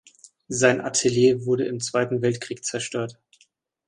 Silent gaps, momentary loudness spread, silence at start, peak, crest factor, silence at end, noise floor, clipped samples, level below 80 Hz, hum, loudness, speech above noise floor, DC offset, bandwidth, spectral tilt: none; 10 LU; 0.5 s; -4 dBFS; 20 dB; 0.75 s; -64 dBFS; under 0.1%; -62 dBFS; none; -23 LUFS; 41 dB; under 0.1%; 11.5 kHz; -4 dB/octave